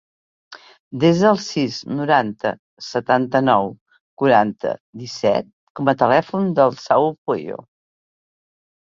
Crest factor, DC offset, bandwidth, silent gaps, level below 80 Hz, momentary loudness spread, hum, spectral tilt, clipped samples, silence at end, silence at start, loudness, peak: 18 dB; under 0.1%; 7.6 kHz; 0.80-0.91 s, 2.59-2.77 s, 3.81-3.86 s, 4.00-4.17 s, 4.80-4.93 s, 5.53-5.75 s, 7.18-7.26 s; -60 dBFS; 14 LU; none; -6 dB/octave; under 0.1%; 1.3 s; 0.5 s; -19 LUFS; -2 dBFS